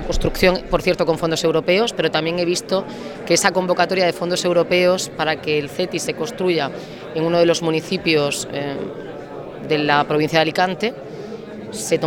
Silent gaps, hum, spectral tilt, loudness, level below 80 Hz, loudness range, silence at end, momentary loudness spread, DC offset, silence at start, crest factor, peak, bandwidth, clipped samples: none; none; -4 dB/octave; -19 LUFS; -38 dBFS; 2 LU; 0 s; 15 LU; under 0.1%; 0 s; 20 dB; 0 dBFS; 17.5 kHz; under 0.1%